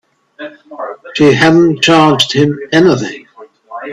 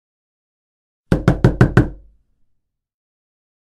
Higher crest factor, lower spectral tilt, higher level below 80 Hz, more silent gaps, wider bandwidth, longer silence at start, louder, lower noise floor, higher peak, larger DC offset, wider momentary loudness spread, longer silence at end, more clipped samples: second, 12 dB vs 20 dB; second, -5 dB/octave vs -8.5 dB/octave; second, -50 dBFS vs -30 dBFS; neither; about the same, 12 kHz vs 11 kHz; second, 0.4 s vs 1.1 s; first, -9 LUFS vs -16 LUFS; second, -39 dBFS vs -67 dBFS; about the same, 0 dBFS vs 0 dBFS; neither; first, 22 LU vs 8 LU; second, 0 s vs 1.75 s; neither